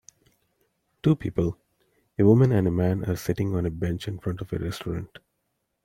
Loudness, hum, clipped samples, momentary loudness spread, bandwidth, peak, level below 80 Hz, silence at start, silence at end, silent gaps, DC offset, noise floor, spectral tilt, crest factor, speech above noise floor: -25 LUFS; none; under 0.1%; 14 LU; 16.5 kHz; -6 dBFS; -50 dBFS; 1.05 s; 0.8 s; none; under 0.1%; -77 dBFS; -8 dB/octave; 20 dB; 53 dB